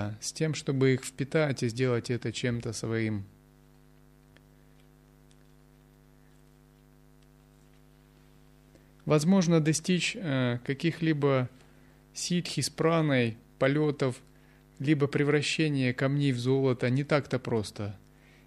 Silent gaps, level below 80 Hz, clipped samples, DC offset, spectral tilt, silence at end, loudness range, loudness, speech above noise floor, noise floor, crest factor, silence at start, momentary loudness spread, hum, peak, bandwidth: none; -62 dBFS; under 0.1%; under 0.1%; -5.5 dB/octave; 0.5 s; 8 LU; -28 LUFS; 30 dB; -58 dBFS; 18 dB; 0 s; 9 LU; none; -12 dBFS; 13 kHz